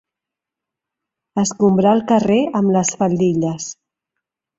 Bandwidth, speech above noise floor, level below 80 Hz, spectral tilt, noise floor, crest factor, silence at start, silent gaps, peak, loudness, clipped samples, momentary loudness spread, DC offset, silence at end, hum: 8 kHz; 69 dB; -56 dBFS; -6 dB/octave; -85 dBFS; 16 dB; 1.35 s; none; -2 dBFS; -17 LUFS; under 0.1%; 10 LU; under 0.1%; 0.85 s; none